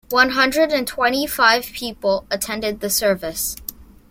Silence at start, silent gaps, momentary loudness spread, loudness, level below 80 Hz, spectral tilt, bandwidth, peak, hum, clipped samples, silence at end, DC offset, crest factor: 0.1 s; none; 9 LU; -19 LUFS; -46 dBFS; -2 dB/octave; 17 kHz; -2 dBFS; none; under 0.1%; 0.25 s; under 0.1%; 18 dB